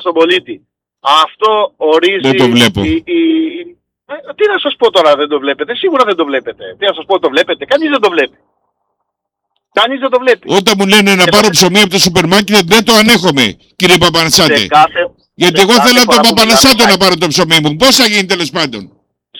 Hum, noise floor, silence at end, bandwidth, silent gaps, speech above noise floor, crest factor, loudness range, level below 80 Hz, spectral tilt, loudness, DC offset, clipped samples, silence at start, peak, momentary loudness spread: none; -73 dBFS; 0 s; 20 kHz; none; 64 dB; 10 dB; 7 LU; -42 dBFS; -3 dB/octave; -8 LUFS; under 0.1%; 0.3%; 0 s; 0 dBFS; 10 LU